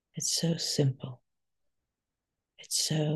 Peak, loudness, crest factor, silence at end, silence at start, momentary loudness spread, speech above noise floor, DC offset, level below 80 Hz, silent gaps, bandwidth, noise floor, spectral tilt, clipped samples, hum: -14 dBFS; -29 LUFS; 20 dB; 0 s; 0.15 s; 10 LU; 58 dB; under 0.1%; -74 dBFS; none; 12.5 kHz; -88 dBFS; -4 dB/octave; under 0.1%; none